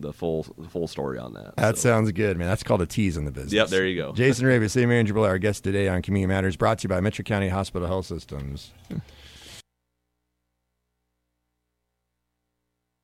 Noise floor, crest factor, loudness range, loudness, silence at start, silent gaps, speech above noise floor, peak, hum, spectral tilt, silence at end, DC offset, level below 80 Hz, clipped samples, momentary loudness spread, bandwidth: -79 dBFS; 20 dB; 17 LU; -24 LUFS; 0 s; none; 55 dB; -6 dBFS; 60 Hz at -45 dBFS; -5.5 dB/octave; 3.45 s; under 0.1%; -46 dBFS; under 0.1%; 15 LU; 15 kHz